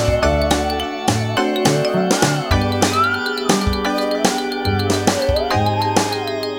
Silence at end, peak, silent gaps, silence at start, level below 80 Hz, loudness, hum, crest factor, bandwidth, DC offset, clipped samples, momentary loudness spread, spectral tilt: 0 s; 0 dBFS; none; 0 s; -30 dBFS; -18 LUFS; none; 18 dB; over 20 kHz; under 0.1%; under 0.1%; 3 LU; -4.5 dB/octave